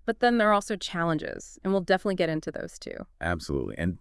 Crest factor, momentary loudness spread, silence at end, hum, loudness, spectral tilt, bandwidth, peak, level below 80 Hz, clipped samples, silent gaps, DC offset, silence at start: 18 dB; 15 LU; 0.05 s; none; -27 LUFS; -5.5 dB/octave; 12 kHz; -10 dBFS; -50 dBFS; under 0.1%; none; under 0.1%; 0.05 s